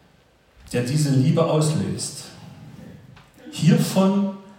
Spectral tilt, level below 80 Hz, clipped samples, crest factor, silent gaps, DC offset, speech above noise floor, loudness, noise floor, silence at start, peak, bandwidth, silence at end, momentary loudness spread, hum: -6 dB/octave; -58 dBFS; under 0.1%; 16 dB; none; under 0.1%; 37 dB; -21 LUFS; -57 dBFS; 0.65 s; -6 dBFS; 16.5 kHz; 0.1 s; 23 LU; none